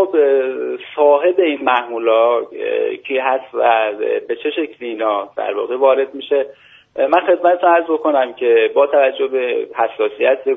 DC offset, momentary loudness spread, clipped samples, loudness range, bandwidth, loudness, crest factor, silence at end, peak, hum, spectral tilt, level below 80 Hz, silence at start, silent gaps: under 0.1%; 8 LU; under 0.1%; 4 LU; 3.9 kHz; -16 LUFS; 16 dB; 0 s; 0 dBFS; none; 0 dB/octave; -70 dBFS; 0 s; none